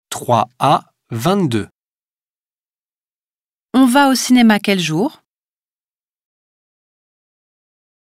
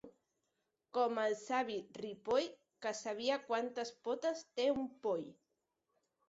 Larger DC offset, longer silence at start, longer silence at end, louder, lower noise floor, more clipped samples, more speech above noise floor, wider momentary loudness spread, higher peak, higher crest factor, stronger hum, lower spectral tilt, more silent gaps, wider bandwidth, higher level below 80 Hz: neither; about the same, 0.1 s vs 0.05 s; first, 3.05 s vs 0.95 s; first, -15 LUFS vs -39 LUFS; first, under -90 dBFS vs -86 dBFS; neither; first, over 76 dB vs 48 dB; first, 11 LU vs 8 LU; first, 0 dBFS vs -22 dBFS; about the same, 18 dB vs 18 dB; neither; first, -5 dB/octave vs -2 dB/octave; first, 1.71-3.69 s vs none; first, 16 kHz vs 7.6 kHz; first, -62 dBFS vs -80 dBFS